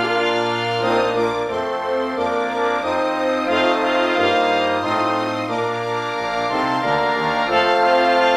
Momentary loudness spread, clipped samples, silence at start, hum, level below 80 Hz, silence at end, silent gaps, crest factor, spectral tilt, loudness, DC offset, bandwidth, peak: 6 LU; under 0.1%; 0 s; none; -56 dBFS; 0 s; none; 16 dB; -4.5 dB/octave; -19 LUFS; under 0.1%; 13.5 kHz; -2 dBFS